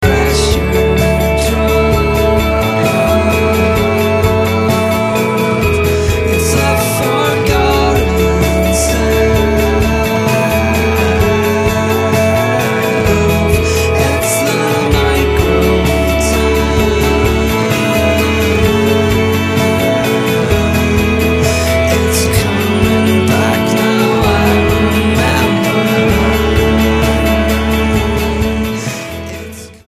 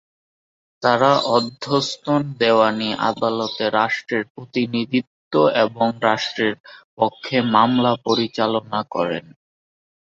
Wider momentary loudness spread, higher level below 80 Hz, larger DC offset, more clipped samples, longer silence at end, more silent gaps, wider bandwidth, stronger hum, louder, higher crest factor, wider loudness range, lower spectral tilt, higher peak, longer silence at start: second, 2 LU vs 8 LU; first, -20 dBFS vs -64 dBFS; neither; neither; second, 0.15 s vs 1 s; second, none vs 4.30-4.35 s, 5.07-5.31 s, 6.60-6.64 s, 6.84-6.97 s; first, 15.5 kHz vs 7.8 kHz; neither; first, -12 LUFS vs -20 LUFS; second, 12 dB vs 18 dB; about the same, 1 LU vs 2 LU; about the same, -5.5 dB/octave vs -5.5 dB/octave; about the same, 0 dBFS vs -2 dBFS; second, 0 s vs 0.8 s